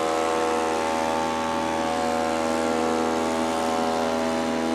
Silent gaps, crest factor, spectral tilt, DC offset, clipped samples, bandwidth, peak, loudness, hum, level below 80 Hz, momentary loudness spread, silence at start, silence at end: none; 14 dB; -3.5 dB/octave; under 0.1%; under 0.1%; 15 kHz; -10 dBFS; -24 LUFS; none; -56 dBFS; 1 LU; 0 s; 0 s